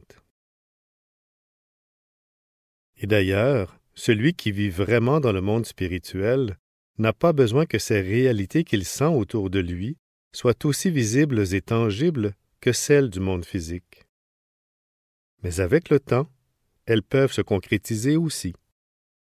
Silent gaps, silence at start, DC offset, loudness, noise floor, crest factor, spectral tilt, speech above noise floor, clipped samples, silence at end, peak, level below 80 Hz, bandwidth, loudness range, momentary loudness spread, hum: 6.59-6.94 s, 9.99-10.31 s, 14.09-15.38 s; 3 s; under 0.1%; -23 LUFS; -71 dBFS; 18 dB; -6 dB/octave; 49 dB; under 0.1%; 0.8 s; -6 dBFS; -44 dBFS; 16 kHz; 5 LU; 11 LU; none